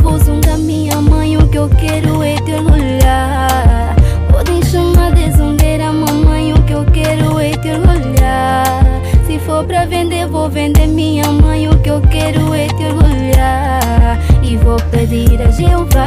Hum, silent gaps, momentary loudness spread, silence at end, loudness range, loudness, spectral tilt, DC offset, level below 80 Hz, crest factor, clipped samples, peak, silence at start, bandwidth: none; none; 4 LU; 0 s; 1 LU; -12 LUFS; -6.5 dB/octave; under 0.1%; -12 dBFS; 10 dB; under 0.1%; 0 dBFS; 0 s; 15.5 kHz